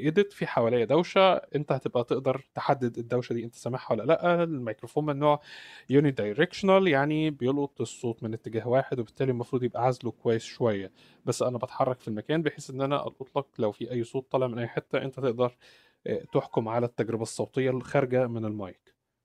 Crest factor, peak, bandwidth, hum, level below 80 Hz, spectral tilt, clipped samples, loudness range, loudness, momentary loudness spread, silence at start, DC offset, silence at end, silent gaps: 20 dB; -8 dBFS; 13.5 kHz; none; -68 dBFS; -6.5 dB/octave; under 0.1%; 5 LU; -28 LUFS; 10 LU; 0 s; under 0.1%; 0.55 s; none